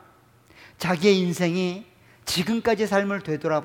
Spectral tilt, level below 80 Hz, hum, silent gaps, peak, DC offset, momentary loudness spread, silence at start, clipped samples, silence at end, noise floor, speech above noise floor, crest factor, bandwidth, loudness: -5 dB/octave; -60 dBFS; none; none; -6 dBFS; under 0.1%; 10 LU; 0.8 s; under 0.1%; 0 s; -55 dBFS; 32 dB; 18 dB; 17.5 kHz; -23 LUFS